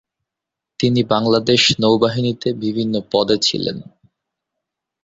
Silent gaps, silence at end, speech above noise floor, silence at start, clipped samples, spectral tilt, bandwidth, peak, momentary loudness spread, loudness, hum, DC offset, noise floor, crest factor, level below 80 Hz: none; 1.2 s; 67 dB; 0.8 s; under 0.1%; -4.5 dB/octave; 7.8 kHz; -2 dBFS; 8 LU; -17 LUFS; none; under 0.1%; -84 dBFS; 16 dB; -54 dBFS